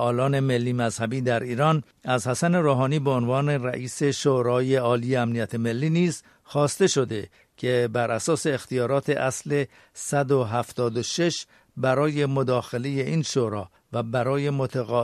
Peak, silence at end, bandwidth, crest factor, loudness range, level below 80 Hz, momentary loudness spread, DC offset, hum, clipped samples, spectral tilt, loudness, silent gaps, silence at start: -8 dBFS; 0 s; 13.5 kHz; 16 dB; 2 LU; -62 dBFS; 7 LU; under 0.1%; none; under 0.1%; -5.5 dB/octave; -24 LUFS; none; 0 s